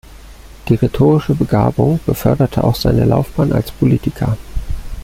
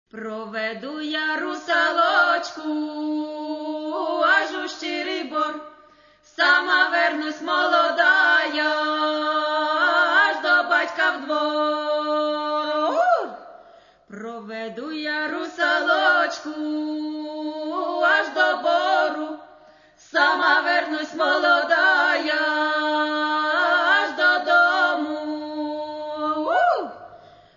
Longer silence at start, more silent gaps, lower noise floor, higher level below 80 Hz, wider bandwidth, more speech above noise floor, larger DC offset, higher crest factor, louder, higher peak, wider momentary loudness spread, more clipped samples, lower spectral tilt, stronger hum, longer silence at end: about the same, 0.25 s vs 0.15 s; neither; second, -36 dBFS vs -54 dBFS; first, -28 dBFS vs -72 dBFS; first, 16.5 kHz vs 7.4 kHz; second, 23 dB vs 32 dB; neither; about the same, 14 dB vs 16 dB; first, -15 LUFS vs -21 LUFS; first, -2 dBFS vs -6 dBFS; second, 10 LU vs 13 LU; neither; first, -8 dB/octave vs -2.5 dB/octave; neither; second, 0 s vs 0.4 s